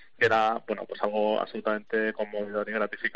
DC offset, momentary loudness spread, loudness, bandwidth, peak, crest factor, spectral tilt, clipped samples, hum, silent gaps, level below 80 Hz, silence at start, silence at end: 0.3%; 8 LU; -28 LUFS; 8 kHz; -10 dBFS; 18 dB; -2.5 dB/octave; under 0.1%; none; none; -72 dBFS; 0.2 s; 0.05 s